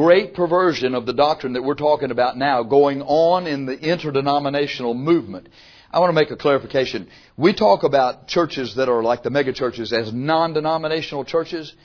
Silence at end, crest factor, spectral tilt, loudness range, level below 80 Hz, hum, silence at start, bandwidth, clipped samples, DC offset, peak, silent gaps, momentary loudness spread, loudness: 0.15 s; 18 dB; -6.5 dB/octave; 2 LU; -56 dBFS; none; 0 s; 5.4 kHz; under 0.1%; under 0.1%; 0 dBFS; none; 7 LU; -19 LUFS